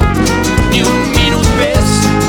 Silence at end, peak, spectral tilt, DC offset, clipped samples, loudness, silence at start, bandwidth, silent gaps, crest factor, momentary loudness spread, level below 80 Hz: 0 s; 0 dBFS; -4.5 dB/octave; under 0.1%; under 0.1%; -11 LUFS; 0 s; over 20 kHz; none; 10 dB; 1 LU; -18 dBFS